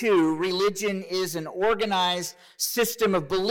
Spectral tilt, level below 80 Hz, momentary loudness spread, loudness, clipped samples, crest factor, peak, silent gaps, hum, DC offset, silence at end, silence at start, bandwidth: -3.5 dB/octave; -58 dBFS; 7 LU; -25 LUFS; under 0.1%; 14 dB; -12 dBFS; none; none; under 0.1%; 0 s; 0 s; 19 kHz